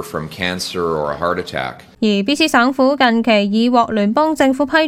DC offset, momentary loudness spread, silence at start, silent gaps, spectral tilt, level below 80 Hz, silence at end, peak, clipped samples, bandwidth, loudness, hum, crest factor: under 0.1%; 8 LU; 0 s; none; -4.5 dB/octave; -48 dBFS; 0 s; 0 dBFS; under 0.1%; 15.5 kHz; -16 LUFS; none; 16 dB